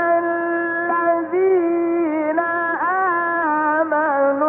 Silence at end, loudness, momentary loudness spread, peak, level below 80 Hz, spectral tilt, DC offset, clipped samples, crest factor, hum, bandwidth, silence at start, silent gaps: 0 s; -19 LUFS; 3 LU; -6 dBFS; -72 dBFS; -4.5 dB/octave; under 0.1%; under 0.1%; 12 dB; none; 3.6 kHz; 0 s; none